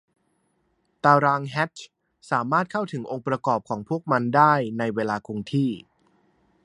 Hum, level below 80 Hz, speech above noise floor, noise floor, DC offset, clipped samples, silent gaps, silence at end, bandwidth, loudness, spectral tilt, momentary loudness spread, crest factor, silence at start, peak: none; -66 dBFS; 47 dB; -70 dBFS; under 0.1%; under 0.1%; none; 0.85 s; 11 kHz; -23 LUFS; -7 dB/octave; 11 LU; 22 dB; 1.05 s; -2 dBFS